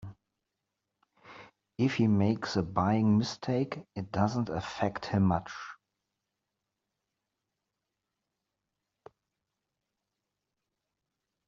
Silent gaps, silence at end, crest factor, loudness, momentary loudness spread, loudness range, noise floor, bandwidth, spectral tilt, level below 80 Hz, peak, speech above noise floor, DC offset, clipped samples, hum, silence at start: none; 5.75 s; 22 dB; -30 LUFS; 16 LU; 7 LU; -86 dBFS; 7.6 kHz; -6.5 dB/octave; -64 dBFS; -12 dBFS; 57 dB; under 0.1%; under 0.1%; none; 0 s